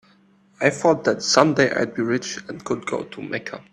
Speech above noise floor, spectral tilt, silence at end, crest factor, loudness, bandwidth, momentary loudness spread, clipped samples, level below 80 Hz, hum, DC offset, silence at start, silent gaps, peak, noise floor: 35 dB; -4 dB/octave; 0.1 s; 22 dB; -21 LUFS; 11.5 kHz; 13 LU; under 0.1%; -62 dBFS; none; under 0.1%; 0.6 s; none; 0 dBFS; -56 dBFS